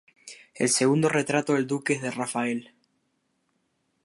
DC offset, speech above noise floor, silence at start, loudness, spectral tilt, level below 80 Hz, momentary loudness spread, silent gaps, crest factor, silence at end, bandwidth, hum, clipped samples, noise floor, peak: under 0.1%; 49 dB; 0.25 s; -25 LUFS; -4 dB/octave; -74 dBFS; 18 LU; none; 18 dB; 1.4 s; 11.5 kHz; none; under 0.1%; -74 dBFS; -8 dBFS